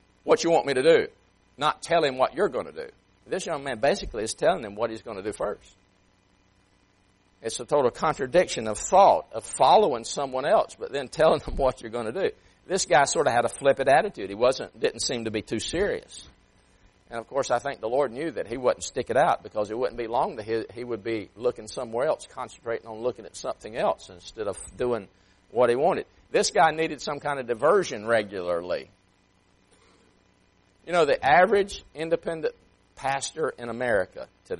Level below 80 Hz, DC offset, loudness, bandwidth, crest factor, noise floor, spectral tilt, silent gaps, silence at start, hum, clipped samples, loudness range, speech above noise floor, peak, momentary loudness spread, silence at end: -52 dBFS; under 0.1%; -25 LUFS; 11.5 kHz; 20 dB; -64 dBFS; -3.5 dB/octave; none; 0.25 s; none; under 0.1%; 8 LU; 39 dB; -6 dBFS; 13 LU; 0 s